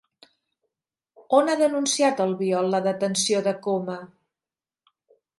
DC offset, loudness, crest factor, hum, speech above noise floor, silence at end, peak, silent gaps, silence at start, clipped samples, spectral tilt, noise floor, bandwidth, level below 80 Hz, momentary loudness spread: under 0.1%; -23 LUFS; 20 dB; none; over 67 dB; 1.35 s; -4 dBFS; none; 1.3 s; under 0.1%; -3.5 dB/octave; under -90 dBFS; 11.5 kHz; -78 dBFS; 6 LU